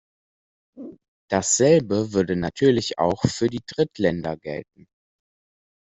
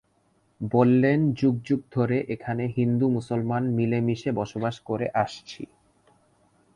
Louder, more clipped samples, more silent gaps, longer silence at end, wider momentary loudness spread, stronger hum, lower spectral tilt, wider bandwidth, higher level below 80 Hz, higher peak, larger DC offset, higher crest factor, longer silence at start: first, -22 LUFS vs -25 LUFS; neither; first, 1.08-1.28 s vs none; first, 1.25 s vs 1.1 s; first, 18 LU vs 10 LU; neither; second, -4.5 dB/octave vs -8.5 dB/octave; second, 8.2 kHz vs 9.4 kHz; first, -54 dBFS vs -60 dBFS; about the same, -4 dBFS vs -6 dBFS; neither; about the same, 20 dB vs 20 dB; first, 0.75 s vs 0.6 s